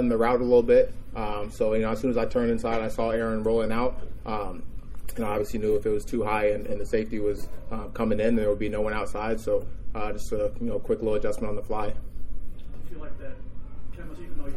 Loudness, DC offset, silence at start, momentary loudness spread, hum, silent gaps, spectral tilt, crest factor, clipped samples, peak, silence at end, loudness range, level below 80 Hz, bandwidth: -27 LUFS; under 0.1%; 0 s; 19 LU; none; none; -7 dB/octave; 16 dB; under 0.1%; -8 dBFS; 0 s; 6 LU; -38 dBFS; 14 kHz